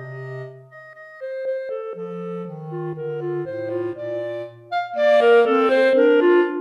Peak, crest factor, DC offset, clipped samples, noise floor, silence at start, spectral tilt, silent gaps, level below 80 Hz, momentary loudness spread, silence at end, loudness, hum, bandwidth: -6 dBFS; 14 dB; under 0.1%; under 0.1%; -42 dBFS; 0 s; -7 dB/octave; none; -74 dBFS; 18 LU; 0 s; -20 LUFS; none; 9.2 kHz